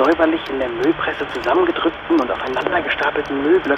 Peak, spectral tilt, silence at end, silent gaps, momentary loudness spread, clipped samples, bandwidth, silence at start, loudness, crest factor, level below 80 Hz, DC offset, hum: -2 dBFS; -5.5 dB/octave; 0 s; none; 5 LU; under 0.1%; 8 kHz; 0 s; -19 LUFS; 16 dB; -46 dBFS; under 0.1%; none